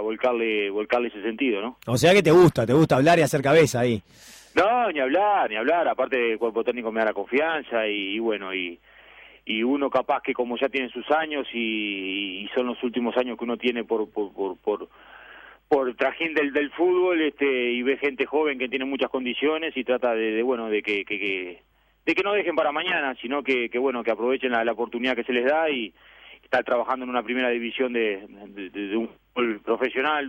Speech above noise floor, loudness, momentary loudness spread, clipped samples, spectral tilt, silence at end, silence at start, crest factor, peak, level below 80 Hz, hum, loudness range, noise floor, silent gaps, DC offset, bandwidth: 26 dB; -24 LUFS; 10 LU; under 0.1%; -5.5 dB/octave; 0 s; 0 s; 18 dB; -6 dBFS; -60 dBFS; none; 7 LU; -50 dBFS; none; under 0.1%; 16 kHz